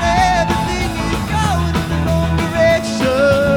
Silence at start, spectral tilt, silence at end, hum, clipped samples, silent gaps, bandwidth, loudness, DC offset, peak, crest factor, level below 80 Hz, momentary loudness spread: 0 s; -5.5 dB/octave; 0 s; none; under 0.1%; none; 18.5 kHz; -16 LUFS; under 0.1%; 0 dBFS; 14 dB; -26 dBFS; 5 LU